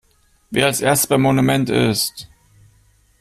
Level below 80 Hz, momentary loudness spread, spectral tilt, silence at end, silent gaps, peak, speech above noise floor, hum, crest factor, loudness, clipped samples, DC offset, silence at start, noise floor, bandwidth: -50 dBFS; 8 LU; -4.5 dB/octave; 0.95 s; none; -2 dBFS; 39 dB; none; 16 dB; -17 LUFS; under 0.1%; under 0.1%; 0.5 s; -56 dBFS; 16 kHz